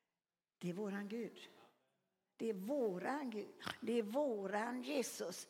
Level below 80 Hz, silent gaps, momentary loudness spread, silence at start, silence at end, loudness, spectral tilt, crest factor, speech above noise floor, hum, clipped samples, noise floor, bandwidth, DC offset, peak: -90 dBFS; none; 8 LU; 0.6 s; 0 s; -43 LUFS; -4.5 dB/octave; 18 dB; over 48 dB; none; under 0.1%; under -90 dBFS; 17 kHz; under 0.1%; -24 dBFS